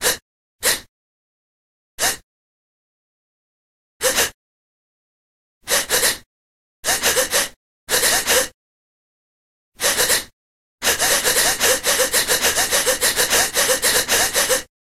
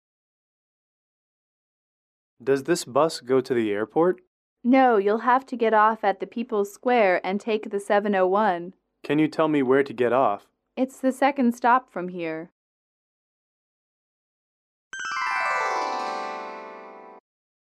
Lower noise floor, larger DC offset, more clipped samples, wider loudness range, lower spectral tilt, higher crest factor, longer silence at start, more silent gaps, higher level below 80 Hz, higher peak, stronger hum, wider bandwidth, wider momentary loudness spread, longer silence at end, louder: first, under -90 dBFS vs -43 dBFS; neither; neither; about the same, 10 LU vs 8 LU; second, 0.5 dB/octave vs -5.5 dB/octave; about the same, 20 dB vs 18 dB; second, 0 s vs 2.4 s; first, 0.22-0.59 s, 0.89-1.98 s, 2.23-4.00 s, 4.34-5.61 s, 6.26-6.83 s, 7.56-7.87 s, 8.54-9.72 s, 10.33-10.78 s vs 4.27-4.56 s, 12.52-14.91 s; first, -46 dBFS vs -76 dBFS; first, -2 dBFS vs -8 dBFS; neither; first, 16 kHz vs 14 kHz; second, 7 LU vs 14 LU; second, 0.15 s vs 0.45 s; first, -17 LUFS vs -23 LUFS